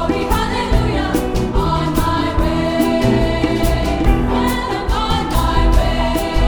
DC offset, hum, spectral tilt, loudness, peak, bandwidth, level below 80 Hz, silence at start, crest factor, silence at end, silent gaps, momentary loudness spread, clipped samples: under 0.1%; none; -6 dB/octave; -17 LUFS; 0 dBFS; over 20 kHz; -20 dBFS; 0 s; 16 dB; 0 s; none; 3 LU; under 0.1%